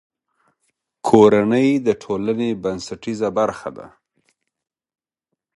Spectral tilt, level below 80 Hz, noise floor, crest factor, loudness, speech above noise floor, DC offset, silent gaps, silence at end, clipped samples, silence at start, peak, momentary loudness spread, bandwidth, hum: -6.5 dB/octave; -56 dBFS; -80 dBFS; 20 dB; -18 LUFS; 62 dB; under 0.1%; none; 1.7 s; under 0.1%; 1.05 s; 0 dBFS; 15 LU; 11.5 kHz; none